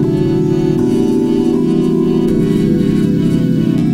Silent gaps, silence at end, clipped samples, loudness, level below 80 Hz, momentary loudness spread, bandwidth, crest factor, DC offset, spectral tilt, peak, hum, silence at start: none; 0 s; under 0.1%; -13 LUFS; -34 dBFS; 1 LU; 15 kHz; 12 dB; under 0.1%; -8.5 dB/octave; 0 dBFS; none; 0 s